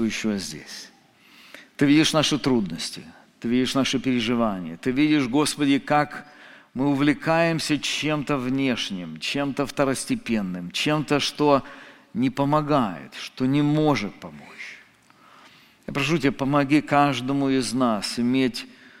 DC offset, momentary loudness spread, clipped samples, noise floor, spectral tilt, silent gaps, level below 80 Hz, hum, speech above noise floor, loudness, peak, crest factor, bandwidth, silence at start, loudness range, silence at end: under 0.1%; 15 LU; under 0.1%; -55 dBFS; -5 dB/octave; none; -52 dBFS; none; 32 dB; -23 LUFS; -4 dBFS; 20 dB; 15.5 kHz; 0 s; 3 LU; 0.1 s